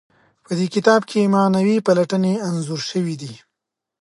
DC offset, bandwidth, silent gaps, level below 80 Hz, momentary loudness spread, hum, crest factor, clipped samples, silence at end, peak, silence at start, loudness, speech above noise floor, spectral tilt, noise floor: under 0.1%; 11.5 kHz; none; -66 dBFS; 10 LU; none; 18 dB; under 0.1%; 0.65 s; 0 dBFS; 0.5 s; -19 LUFS; 64 dB; -6 dB/octave; -82 dBFS